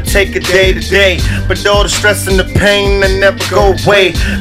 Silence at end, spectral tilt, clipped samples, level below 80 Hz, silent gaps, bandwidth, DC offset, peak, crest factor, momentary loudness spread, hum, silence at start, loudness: 0 s; -4 dB/octave; 0.5%; -18 dBFS; none; 16 kHz; under 0.1%; 0 dBFS; 10 dB; 4 LU; none; 0 s; -9 LUFS